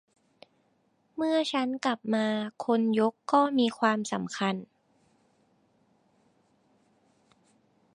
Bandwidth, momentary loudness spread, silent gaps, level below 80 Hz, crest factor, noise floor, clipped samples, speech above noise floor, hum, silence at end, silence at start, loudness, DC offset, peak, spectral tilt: 10.5 kHz; 7 LU; none; -80 dBFS; 22 dB; -70 dBFS; under 0.1%; 43 dB; none; 3.3 s; 1.15 s; -28 LUFS; under 0.1%; -10 dBFS; -5 dB/octave